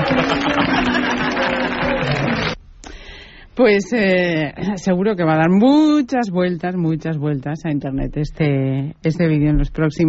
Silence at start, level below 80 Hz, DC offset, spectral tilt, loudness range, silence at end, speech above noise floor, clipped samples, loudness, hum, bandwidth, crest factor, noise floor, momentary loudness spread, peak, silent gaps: 0 s; -34 dBFS; under 0.1%; -5 dB/octave; 4 LU; 0 s; 22 dB; under 0.1%; -18 LUFS; none; 8 kHz; 14 dB; -38 dBFS; 9 LU; -4 dBFS; none